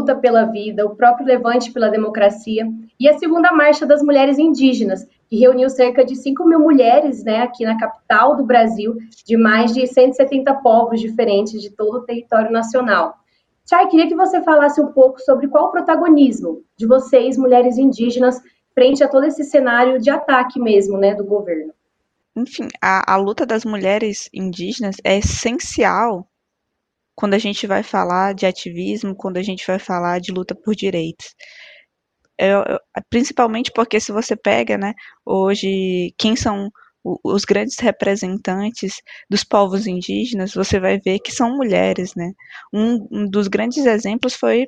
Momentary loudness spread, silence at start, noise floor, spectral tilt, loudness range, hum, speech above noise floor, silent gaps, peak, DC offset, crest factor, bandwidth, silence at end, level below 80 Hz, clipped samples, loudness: 12 LU; 0 s; -75 dBFS; -5 dB/octave; 7 LU; none; 60 dB; none; 0 dBFS; under 0.1%; 16 dB; 9.2 kHz; 0 s; -46 dBFS; under 0.1%; -16 LUFS